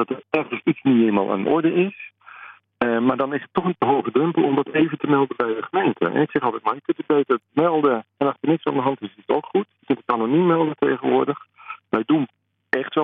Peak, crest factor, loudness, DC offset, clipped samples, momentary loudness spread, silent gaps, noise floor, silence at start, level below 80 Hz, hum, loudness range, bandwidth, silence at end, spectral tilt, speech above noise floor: -2 dBFS; 18 dB; -21 LUFS; under 0.1%; under 0.1%; 8 LU; none; -44 dBFS; 0 s; -66 dBFS; none; 1 LU; 4.4 kHz; 0 s; -10 dB/octave; 23 dB